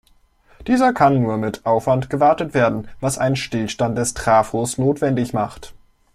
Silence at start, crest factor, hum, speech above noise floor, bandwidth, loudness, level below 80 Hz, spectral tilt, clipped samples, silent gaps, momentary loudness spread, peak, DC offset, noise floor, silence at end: 0.6 s; 16 dB; none; 37 dB; 14.5 kHz; -19 LUFS; -46 dBFS; -5.5 dB/octave; under 0.1%; none; 8 LU; -2 dBFS; under 0.1%; -55 dBFS; 0.4 s